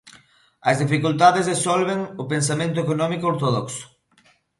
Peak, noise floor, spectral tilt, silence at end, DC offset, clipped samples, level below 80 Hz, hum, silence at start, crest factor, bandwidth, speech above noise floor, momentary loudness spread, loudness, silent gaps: -2 dBFS; -59 dBFS; -5 dB/octave; 0.75 s; under 0.1%; under 0.1%; -62 dBFS; none; 0.05 s; 20 dB; 11.5 kHz; 39 dB; 10 LU; -21 LUFS; none